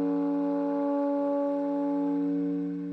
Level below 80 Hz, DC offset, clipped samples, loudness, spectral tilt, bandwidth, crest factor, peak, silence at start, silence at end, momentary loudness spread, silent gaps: under -90 dBFS; under 0.1%; under 0.1%; -29 LUFS; -10 dB/octave; 4.3 kHz; 10 dB; -18 dBFS; 0 s; 0 s; 2 LU; none